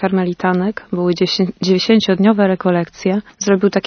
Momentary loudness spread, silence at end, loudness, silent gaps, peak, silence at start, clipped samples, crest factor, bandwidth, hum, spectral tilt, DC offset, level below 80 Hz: 7 LU; 0.05 s; -16 LUFS; none; -2 dBFS; 0 s; under 0.1%; 14 dB; 6.6 kHz; none; -5.5 dB/octave; under 0.1%; -54 dBFS